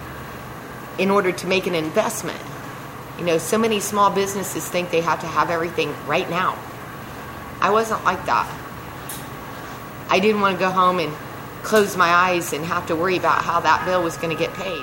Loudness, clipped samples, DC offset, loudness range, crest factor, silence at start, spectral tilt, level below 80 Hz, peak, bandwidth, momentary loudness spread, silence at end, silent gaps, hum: -20 LUFS; under 0.1%; under 0.1%; 4 LU; 18 dB; 0 s; -4 dB/octave; -50 dBFS; -2 dBFS; 16.5 kHz; 16 LU; 0 s; none; none